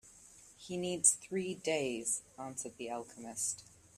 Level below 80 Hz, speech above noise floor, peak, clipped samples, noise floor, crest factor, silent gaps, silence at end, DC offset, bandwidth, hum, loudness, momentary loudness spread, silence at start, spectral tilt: -74 dBFS; 22 dB; -12 dBFS; under 0.1%; -59 dBFS; 26 dB; none; 0.35 s; under 0.1%; 15.5 kHz; none; -35 LUFS; 16 LU; 0.05 s; -2.5 dB/octave